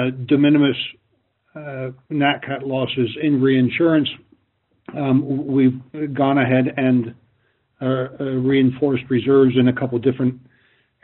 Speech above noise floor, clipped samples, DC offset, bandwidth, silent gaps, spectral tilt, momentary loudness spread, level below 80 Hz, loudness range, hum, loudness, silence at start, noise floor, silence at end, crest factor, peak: 47 dB; under 0.1%; under 0.1%; 4.2 kHz; none; -5.5 dB/octave; 13 LU; -60 dBFS; 2 LU; none; -19 LUFS; 0 s; -66 dBFS; 0.65 s; 16 dB; -2 dBFS